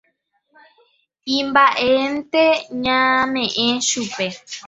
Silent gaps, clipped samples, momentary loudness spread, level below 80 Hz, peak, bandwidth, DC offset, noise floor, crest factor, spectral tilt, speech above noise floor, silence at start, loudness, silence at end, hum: none; under 0.1%; 9 LU; -58 dBFS; -2 dBFS; 8.4 kHz; under 0.1%; -67 dBFS; 18 dB; -2 dB/octave; 49 dB; 1.25 s; -17 LUFS; 0 s; none